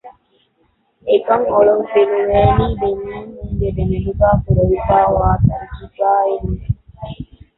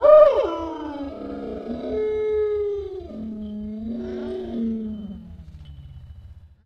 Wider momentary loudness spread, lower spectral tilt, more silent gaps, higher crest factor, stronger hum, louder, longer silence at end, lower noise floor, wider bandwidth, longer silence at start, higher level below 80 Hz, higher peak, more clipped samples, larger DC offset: second, 16 LU vs 20 LU; first, -12.5 dB/octave vs -8 dB/octave; neither; second, 14 dB vs 20 dB; neither; first, -16 LUFS vs -24 LUFS; first, 0.35 s vs 0.2 s; first, -61 dBFS vs -44 dBFS; second, 4.1 kHz vs 6 kHz; about the same, 0.05 s vs 0 s; first, -28 dBFS vs -46 dBFS; about the same, -2 dBFS vs -2 dBFS; neither; neither